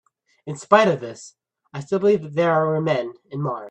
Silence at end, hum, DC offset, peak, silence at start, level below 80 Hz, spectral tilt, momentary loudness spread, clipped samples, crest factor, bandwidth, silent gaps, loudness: 0 s; none; under 0.1%; 0 dBFS; 0.45 s; -66 dBFS; -6 dB/octave; 20 LU; under 0.1%; 22 dB; 9.4 kHz; none; -20 LUFS